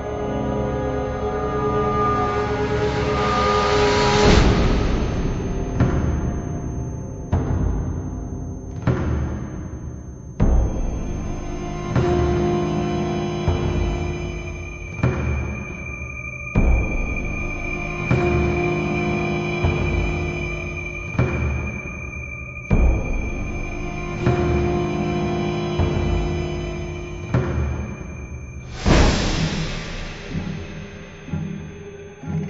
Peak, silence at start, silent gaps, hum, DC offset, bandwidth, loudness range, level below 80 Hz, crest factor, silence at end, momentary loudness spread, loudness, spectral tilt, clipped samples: -2 dBFS; 0 s; none; none; under 0.1%; 8 kHz; 7 LU; -26 dBFS; 20 dB; 0 s; 12 LU; -23 LUFS; -6.5 dB/octave; under 0.1%